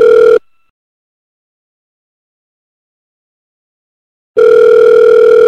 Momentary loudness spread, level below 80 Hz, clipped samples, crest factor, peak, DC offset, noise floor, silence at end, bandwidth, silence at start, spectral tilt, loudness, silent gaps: 7 LU; -54 dBFS; under 0.1%; 10 dB; 0 dBFS; under 0.1%; under -90 dBFS; 0 s; 6.4 kHz; 0 s; -4.5 dB/octave; -6 LUFS; 0.70-4.34 s